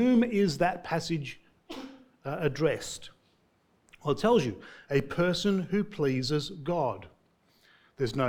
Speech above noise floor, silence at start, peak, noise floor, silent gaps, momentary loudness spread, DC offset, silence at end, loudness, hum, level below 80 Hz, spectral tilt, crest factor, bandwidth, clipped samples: 40 dB; 0 s; -12 dBFS; -68 dBFS; none; 18 LU; under 0.1%; 0 s; -29 LUFS; none; -58 dBFS; -6 dB/octave; 18 dB; 17.5 kHz; under 0.1%